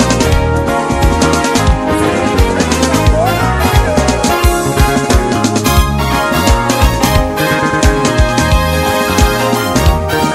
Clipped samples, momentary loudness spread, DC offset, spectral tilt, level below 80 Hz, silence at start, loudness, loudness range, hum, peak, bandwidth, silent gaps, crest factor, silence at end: 0.3%; 2 LU; 0.1%; -5 dB/octave; -16 dBFS; 0 s; -11 LUFS; 0 LU; none; 0 dBFS; 16.5 kHz; none; 10 dB; 0 s